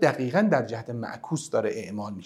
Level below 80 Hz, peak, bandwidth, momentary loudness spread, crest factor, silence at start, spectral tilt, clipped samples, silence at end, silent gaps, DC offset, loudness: -74 dBFS; -6 dBFS; 13 kHz; 12 LU; 20 dB; 0 s; -6 dB/octave; under 0.1%; 0 s; none; under 0.1%; -27 LUFS